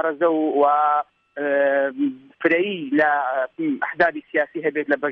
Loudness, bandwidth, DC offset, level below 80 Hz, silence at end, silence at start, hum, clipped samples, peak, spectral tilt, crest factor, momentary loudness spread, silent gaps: -21 LUFS; 5.6 kHz; under 0.1%; -68 dBFS; 0 s; 0 s; none; under 0.1%; -6 dBFS; -7.5 dB/octave; 16 dB; 6 LU; none